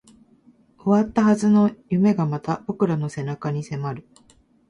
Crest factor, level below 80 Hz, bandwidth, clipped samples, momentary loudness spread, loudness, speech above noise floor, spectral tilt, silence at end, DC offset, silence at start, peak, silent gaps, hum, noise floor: 16 dB; -58 dBFS; 10.5 kHz; under 0.1%; 11 LU; -22 LUFS; 35 dB; -8 dB/octave; 0.7 s; under 0.1%; 0.85 s; -6 dBFS; none; none; -56 dBFS